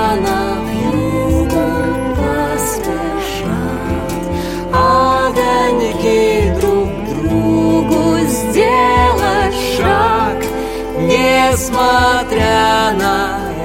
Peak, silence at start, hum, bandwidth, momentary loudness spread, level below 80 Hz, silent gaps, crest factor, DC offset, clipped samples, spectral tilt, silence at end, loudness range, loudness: 0 dBFS; 0 s; none; 17 kHz; 8 LU; -28 dBFS; none; 12 dB; under 0.1%; under 0.1%; -5 dB/octave; 0 s; 4 LU; -14 LUFS